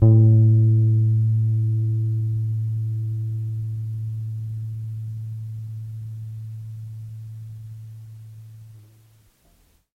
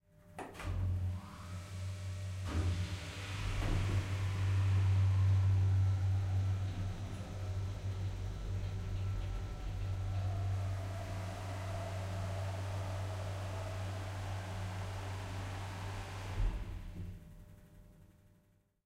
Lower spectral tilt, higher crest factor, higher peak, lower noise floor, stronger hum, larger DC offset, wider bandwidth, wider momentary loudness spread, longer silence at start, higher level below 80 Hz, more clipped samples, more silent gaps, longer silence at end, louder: first, -11.5 dB/octave vs -6.5 dB/octave; about the same, 18 dB vs 14 dB; first, -4 dBFS vs -22 dBFS; second, -59 dBFS vs -71 dBFS; neither; neither; second, 1.1 kHz vs 11 kHz; first, 22 LU vs 13 LU; second, 0 s vs 0.25 s; second, -52 dBFS vs -46 dBFS; neither; neither; first, 1.2 s vs 0.75 s; first, -22 LUFS vs -38 LUFS